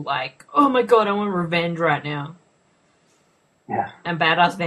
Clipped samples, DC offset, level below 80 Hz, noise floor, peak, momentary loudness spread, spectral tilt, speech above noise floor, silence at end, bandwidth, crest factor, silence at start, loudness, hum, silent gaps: under 0.1%; under 0.1%; -64 dBFS; -62 dBFS; -2 dBFS; 12 LU; -6 dB/octave; 42 dB; 0 s; 12 kHz; 20 dB; 0 s; -20 LUFS; none; none